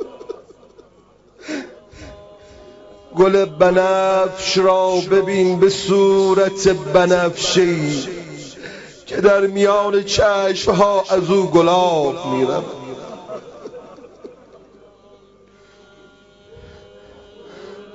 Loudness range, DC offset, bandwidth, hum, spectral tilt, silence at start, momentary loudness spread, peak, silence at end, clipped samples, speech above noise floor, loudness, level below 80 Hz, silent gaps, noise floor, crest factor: 10 LU; under 0.1%; 8 kHz; 50 Hz at -50 dBFS; -5 dB/octave; 0 s; 20 LU; -2 dBFS; 0.1 s; under 0.1%; 36 dB; -16 LUFS; -48 dBFS; none; -51 dBFS; 16 dB